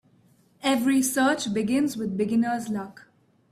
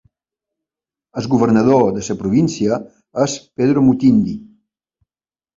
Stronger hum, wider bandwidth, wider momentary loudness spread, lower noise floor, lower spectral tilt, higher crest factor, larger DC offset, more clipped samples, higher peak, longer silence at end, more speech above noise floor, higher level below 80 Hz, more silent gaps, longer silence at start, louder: neither; first, 16 kHz vs 7.6 kHz; second, 9 LU vs 13 LU; second, -60 dBFS vs under -90 dBFS; second, -4 dB/octave vs -6.5 dB/octave; about the same, 14 dB vs 16 dB; neither; neither; second, -10 dBFS vs -2 dBFS; second, 0.6 s vs 1.15 s; second, 36 dB vs over 75 dB; second, -66 dBFS vs -50 dBFS; neither; second, 0.65 s vs 1.15 s; second, -25 LUFS vs -16 LUFS